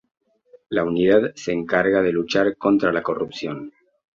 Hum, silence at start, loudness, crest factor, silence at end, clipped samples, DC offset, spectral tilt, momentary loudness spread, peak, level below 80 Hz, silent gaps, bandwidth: none; 0.7 s; -21 LUFS; 18 dB; 0.45 s; under 0.1%; under 0.1%; -6 dB/octave; 12 LU; -4 dBFS; -56 dBFS; none; 7.6 kHz